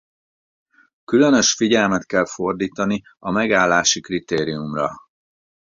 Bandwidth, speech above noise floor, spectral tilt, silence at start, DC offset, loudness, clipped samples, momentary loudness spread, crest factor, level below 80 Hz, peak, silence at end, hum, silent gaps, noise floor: 7.6 kHz; over 71 dB; -3.5 dB/octave; 1.1 s; under 0.1%; -19 LUFS; under 0.1%; 9 LU; 18 dB; -54 dBFS; -2 dBFS; 0.6 s; none; none; under -90 dBFS